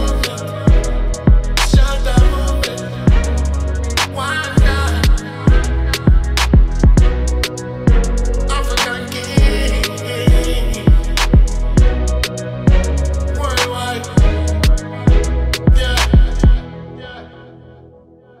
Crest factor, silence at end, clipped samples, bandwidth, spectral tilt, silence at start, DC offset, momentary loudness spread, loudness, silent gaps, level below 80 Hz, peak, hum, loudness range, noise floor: 14 dB; 0.95 s; under 0.1%; 15 kHz; -5.5 dB/octave; 0 s; under 0.1%; 6 LU; -16 LUFS; none; -14 dBFS; 0 dBFS; none; 2 LU; -44 dBFS